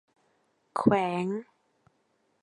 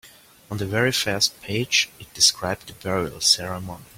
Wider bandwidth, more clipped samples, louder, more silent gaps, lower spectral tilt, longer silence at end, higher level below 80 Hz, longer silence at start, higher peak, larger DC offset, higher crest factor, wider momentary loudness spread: second, 11.5 kHz vs 16.5 kHz; neither; second, -28 LUFS vs -21 LUFS; neither; first, -7.5 dB/octave vs -2 dB/octave; first, 1 s vs 0.15 s; second, -64 dBFS vs -54 dBFS; first, 0.75 s vs 0.05 s; second, -8 dBFS vs -2 dBFS; neither; about the same, 24 dB vs 22 dB; about the same, 12 LU vs 13 LU